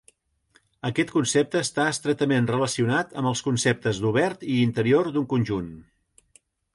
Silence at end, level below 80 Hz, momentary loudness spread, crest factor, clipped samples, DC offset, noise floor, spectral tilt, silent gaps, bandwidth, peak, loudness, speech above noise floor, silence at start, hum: 0.95 s; -58 dBFS; 5 LU; 16 dB; under 0.1%; under 0.1%; -64 dBFS; -5 dB/octave; none; 11.5 kHz; -8 dBFS; -24 LUFS; 41 dB; 0.85 s; none